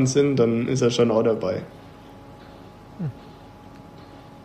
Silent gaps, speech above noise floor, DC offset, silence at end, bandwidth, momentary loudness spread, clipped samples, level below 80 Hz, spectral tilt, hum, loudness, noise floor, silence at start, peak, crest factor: none; 24 dB; under 0.1%; 0.05 s; 10.5 kHz; 25 LU; under 0.1%; -56 dBFS; -6 dB/octave; none; -22 LUFS; -44 dBFS; 0 s; -6 dBFS; 18 dB